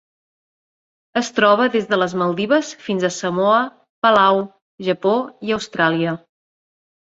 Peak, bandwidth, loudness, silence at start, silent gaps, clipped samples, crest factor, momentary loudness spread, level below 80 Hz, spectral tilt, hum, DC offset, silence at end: -2 dBFS; 8 kHz; -18 LUFS; 1.15 s; 3.89-4.02 s, 4.62-4.78 s; under 0.1%; 18 dB; 10 LU; -62 dBFS; -5 dB/octave; none; under 0.1%; 0.85 s